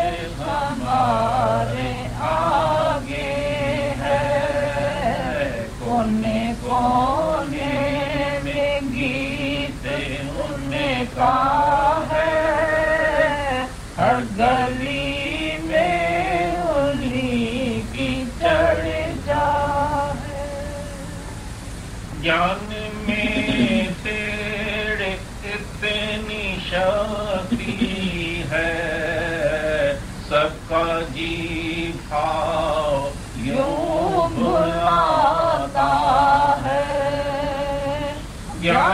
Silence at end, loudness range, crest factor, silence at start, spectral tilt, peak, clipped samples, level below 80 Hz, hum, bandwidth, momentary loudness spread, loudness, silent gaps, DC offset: 0 s; 4 LU; 16 dB; 0 s; -5.5 dB/octave; -6 dBFS; under 0.1%; -36 dBFS; none; 15.5 kHz; 9 LU; -21 LUFS; none; under 0.1%